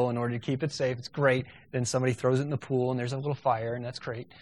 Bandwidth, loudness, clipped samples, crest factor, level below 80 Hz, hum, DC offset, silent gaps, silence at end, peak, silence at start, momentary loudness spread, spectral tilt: 11.5 kHz; -30 LUFS; under 0.1%; 18 dB; -64 dBFS; none; under 0.1%; none; 0 s; -10 dBFS; 0 s; 9 LU; -6 dB/octave